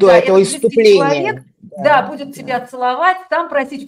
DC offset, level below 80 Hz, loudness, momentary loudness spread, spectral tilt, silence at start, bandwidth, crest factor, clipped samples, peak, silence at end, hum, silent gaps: under 0.1%; -58 dBFS; -14 LUFS; 12 LU; -4.5 dB/octave; 0 s; 14 kHz; 14 dB; under 0.1%; 0 dBFS; 0 s; none; none